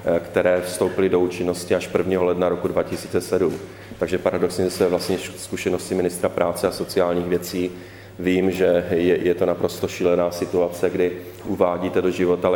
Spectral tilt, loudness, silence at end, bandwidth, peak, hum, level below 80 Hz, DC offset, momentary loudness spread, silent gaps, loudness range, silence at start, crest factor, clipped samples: -5.5 dB/octave; -22 LUFS; 0 s; 18 kHz; -2 dBFS; none; -52 dBFS; under 0.1%; 7 LU; none; 2 LU; 0 s; 18 dB; under 0.1%